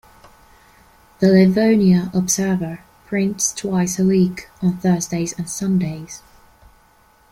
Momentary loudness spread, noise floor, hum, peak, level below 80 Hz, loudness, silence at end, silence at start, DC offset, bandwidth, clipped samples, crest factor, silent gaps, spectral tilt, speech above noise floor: 13 LU; -54 dBFS; none; -2 dBFS; -52 dBFS; -18 LUFS; 1.1 s; 1.2 s; under 0.1%; 16 kHz; under 0.1%; 18 dB; none; -5.5 dB/octave; 36 dB